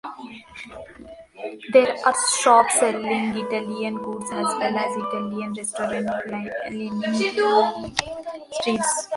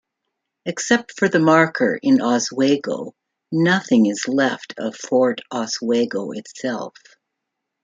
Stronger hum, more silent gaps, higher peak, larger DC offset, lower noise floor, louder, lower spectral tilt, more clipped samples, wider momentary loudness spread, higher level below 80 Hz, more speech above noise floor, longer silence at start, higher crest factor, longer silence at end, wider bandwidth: neither; neither; about the same, -2 dBFS vs -2 dBFS; neither; second, -43 dBFS vs -80 dBFS; second, -22 LUFS vs -19 LUFS; second, -3 dB/octave vs -4.5 dB/octave; neither; first, 19 LU vs 14 LU; first, -60 dBFS vs -66 dBFS; second, 21 dB vs 61 dB; second, 0.05 s vs 0.65 s; about the same, 20 dB vs 18 dB; second, 0 s vs 0.95 s; first, 11.5 kHz vs 9.4 kHz